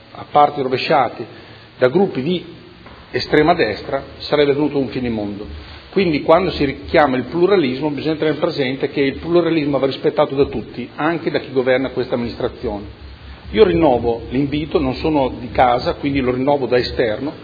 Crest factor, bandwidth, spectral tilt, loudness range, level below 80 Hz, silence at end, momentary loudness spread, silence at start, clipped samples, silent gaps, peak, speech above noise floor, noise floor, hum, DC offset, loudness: 18 dB; 5 kHz; -8 dB/octave; 2 LU; -40 dBFS; 0 s; 11 LU; 0.1 s; under 0.1%; none; 0 dBFS; 23 dB; -40 dBFS; none; under 0.1%; -18 LUFS